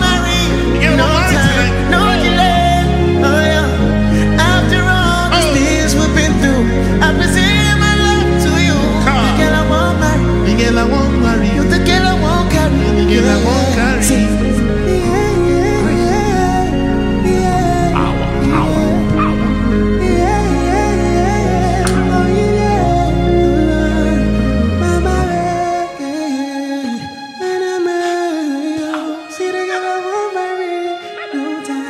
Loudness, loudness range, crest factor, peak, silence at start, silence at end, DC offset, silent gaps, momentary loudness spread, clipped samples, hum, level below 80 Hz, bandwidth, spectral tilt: -13 LUFS; 7 LU; 12 dB; 0 dBFS; 0 s; 0 s; under 0.1%; none; 8 LU; under 0.1%; none; -20 dBFS; 15.5 kHz; -5.5 dB/octave